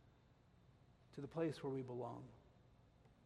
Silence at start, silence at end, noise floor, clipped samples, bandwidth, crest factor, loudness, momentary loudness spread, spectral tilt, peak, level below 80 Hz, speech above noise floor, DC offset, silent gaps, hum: 0 s; 0 s; -71 dBFS; under 0.1%; 12 kHz; 20 dB; -47 LUFS; 15 LU; -7.5 dB/octave; -30 dBFS; -76 dBFS; 25 dB; under 0.1%; none; none